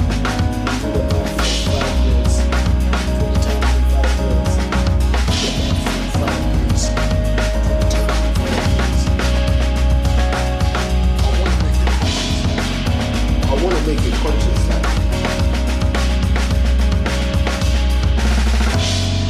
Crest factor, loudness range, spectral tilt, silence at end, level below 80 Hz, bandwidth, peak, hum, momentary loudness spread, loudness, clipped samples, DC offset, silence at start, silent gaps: 12 dB; 1 LU; -5.5 dB/octave; 0 s; -18 dBFS; 13.5 kHz; -4 dBFS; none; 2 LU; -18 LUFS; under 0.1%; under 0.1%; 0 s; none